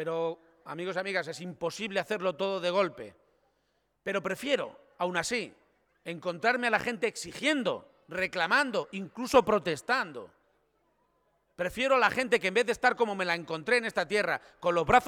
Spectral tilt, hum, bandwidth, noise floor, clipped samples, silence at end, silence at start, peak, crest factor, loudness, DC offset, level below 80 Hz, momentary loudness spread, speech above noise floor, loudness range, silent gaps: -4 dB/octave; none; 17.5 kHz; -75 dBFS; under 0.1%; 0 s; 0 s; -8 dBFS; 22 dB; -29 LUFS; under 0.1%; -60 dBFS; 14 LU; 46 dB; 5 LU; none